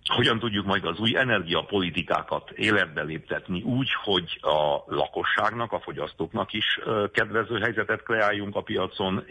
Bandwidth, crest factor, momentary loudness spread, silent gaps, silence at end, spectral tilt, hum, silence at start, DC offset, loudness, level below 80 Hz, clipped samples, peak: 10.5 kHz; 16 dB; 8 LU; none; 0.05 s; -5.5 dB/octave; none; 0.05 s; under 0.1%; -26 LUFS; -56 dBFS; under 0.1%; -10 dBFS